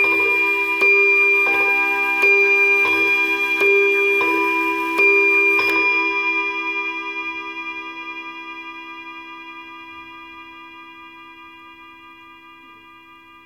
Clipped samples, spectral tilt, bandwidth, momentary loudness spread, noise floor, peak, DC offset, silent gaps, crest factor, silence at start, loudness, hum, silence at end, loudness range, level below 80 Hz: under 0.1%; -2.5 dB/octave; 16 kHz; 22 LU; -45 dBFS; -6 dBFS; under 0.1%; none; 14 dB; 0 s; -15 LUFS; none; 1.1 s; 21 LU; -64 dBFS